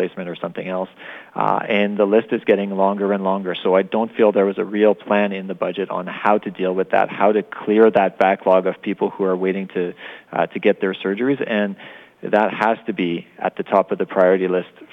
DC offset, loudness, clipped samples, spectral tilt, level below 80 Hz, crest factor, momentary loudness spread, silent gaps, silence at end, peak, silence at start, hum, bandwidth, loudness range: under 0.1%; -19 LUFS; under 0.1%; -8 dB/octave; -72 dBFS; 16 dB; 10 LU; none; 0.1 s; -2 dBFS; 0 s; none; 5.8 kHz; 3 LU